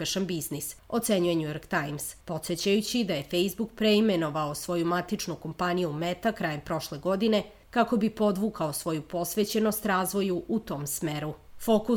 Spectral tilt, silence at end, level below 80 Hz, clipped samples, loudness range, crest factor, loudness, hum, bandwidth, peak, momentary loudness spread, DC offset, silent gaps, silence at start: -4.5 dB/octave; 0 s; -56 dBFS; under 0.1%; 2 LU; 16 dB; -29 LUFS; none; over 20 kHz; -12 dBFS; 7 LU; under 0.1%; none; 0 s